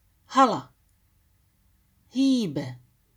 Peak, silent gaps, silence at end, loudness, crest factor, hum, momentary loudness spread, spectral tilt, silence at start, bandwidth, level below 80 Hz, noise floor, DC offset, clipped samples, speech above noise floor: -8 dBFS; none; 0.4 s; -24 LUFS; 20 dB; none; 13 LU; -5.5 dB/octave; 0.3 s; 11 kHz; -68 dBFS; -65 dBFS; under 0.1%; under 0.1%; 42 dB